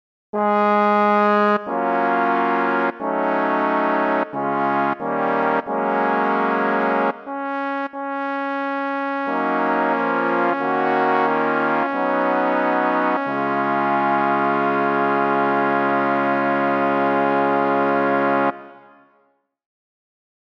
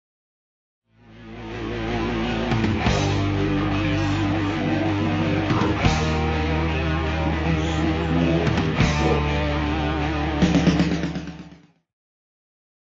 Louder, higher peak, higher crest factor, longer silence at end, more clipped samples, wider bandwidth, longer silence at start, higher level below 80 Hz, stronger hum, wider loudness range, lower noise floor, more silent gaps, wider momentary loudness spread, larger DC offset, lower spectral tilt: about the same, -20 LUFS vs -22 LUFS; about the same, -4 dBFS vs -4 dBFS; about the same, 16 dB vs 18 dB; first, 1.7 s vs 1.3 s; neither; second, 6.4 kHz vs 7.8 kHz; second, 0.35 s vs 1.1 s; second, -74 dBFS vs -32 dBFS; neither; about the same, 3 LU vs 3 LU; first, -63 dBFS vs -48 dBFS; neither; about the same, 6 LU vs 7 LU; neither; about the same, -7.5 dB/octave vs -6.5 dB/octave